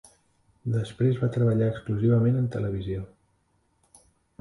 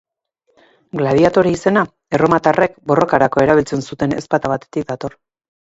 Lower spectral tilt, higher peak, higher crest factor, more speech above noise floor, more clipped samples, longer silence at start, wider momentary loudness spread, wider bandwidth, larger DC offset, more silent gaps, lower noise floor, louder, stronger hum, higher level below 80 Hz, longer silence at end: first, -9 dB/octave vs -6.5 dB/octave; second, -12 dBFS vs 0 dBFS; about the same, 14 dB vs 16 dB; second, 45 dB vs 50 dB; neither; second, 0.65 s vs 0.95 s; about the same, 12 LU vs 11 LU; first, 11.5 kHz vs 8 kHz; neither; neither; about the same, -69 dBFS vs -66 dBFS; second, -26 LUFS vs -16 LUFS; neither; about the same, -52 dBFS vs -48 dBFS; first, 1.35 s vs 0.5 s